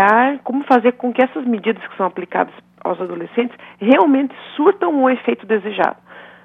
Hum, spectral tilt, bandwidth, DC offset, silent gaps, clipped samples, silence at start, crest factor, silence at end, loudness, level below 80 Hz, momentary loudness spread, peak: 60 Hz at -50 dBFS; -7.5 dB/octave; 5.2 kHz; under 0.1%; none; under 0.1%; 0 s; 16 dB; 0.2 s; -17 LUFS; -70 dBFS; 11 LU; 0 dBFS